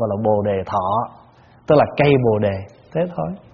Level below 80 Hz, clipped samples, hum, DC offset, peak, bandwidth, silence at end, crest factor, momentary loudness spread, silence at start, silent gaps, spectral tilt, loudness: -48 dBFS; under 0.1%; none; under 0.1%; 0 dBFS; 6.2 kHz; 0.15 s; 18 dB; 13 LU; 0 s; none; -6.5 dB/octave; -19 LUFS